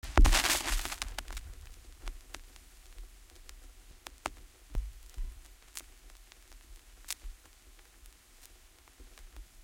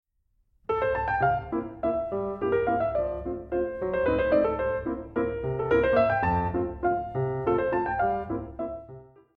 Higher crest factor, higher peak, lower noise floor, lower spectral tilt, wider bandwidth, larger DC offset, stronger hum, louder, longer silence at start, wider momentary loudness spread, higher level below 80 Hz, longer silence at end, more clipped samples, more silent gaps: first, 30 dB vs 16 dB; first, -6 dBFS vs -10 dBFS; second, -59 dBFS vs -70 dBFS; second, -2.5 dB/octave vs -9.5 dB/octave; first, 17 kHz vs 5.2 kHz; neither; neither; second, -35 LUFS vs -27 LUFS; second, 0.05 s vs 0.7 s; first, 27 LU vs 10 LU; first, -36 dBFS vs -46 dBFS; about the same, 0.2 s vs 0.3 s; neither; neither